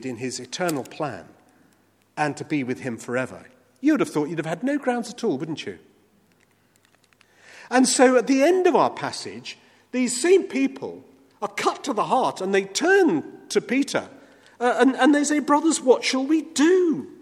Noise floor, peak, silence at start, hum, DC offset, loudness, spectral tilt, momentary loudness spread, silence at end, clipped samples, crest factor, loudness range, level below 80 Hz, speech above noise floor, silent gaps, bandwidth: -61 dBFS; -4 dBFS; 0 s; none; under 0.1%; -22 LUFS; -4 dB/octave; 13 LU; 0.1 s; under 0.1%; 20 dB; 9 LU; -74 dBFS; 40 dB; none; 15 kHz